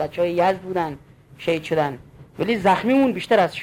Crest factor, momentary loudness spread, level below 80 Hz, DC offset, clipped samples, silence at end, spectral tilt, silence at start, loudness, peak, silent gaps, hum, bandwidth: 16 dB; 11 LU; -54 dBFS; under 0.1%; under 0.1%; 0 s; -6.5 dB/octave; 0 s; -21 LUFS; -6 dBFS; none; none; 16 kHz